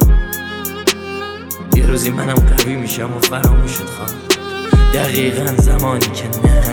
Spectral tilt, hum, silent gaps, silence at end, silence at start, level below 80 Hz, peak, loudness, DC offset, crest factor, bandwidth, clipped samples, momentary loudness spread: -5 dB/octave; none; none; 0 s; 0 s; -16 dBFS; -2 dBFS; -16 LUFS; under 0.1%; 12 dB; 19.5 kHz; under 0.1%; 10 LU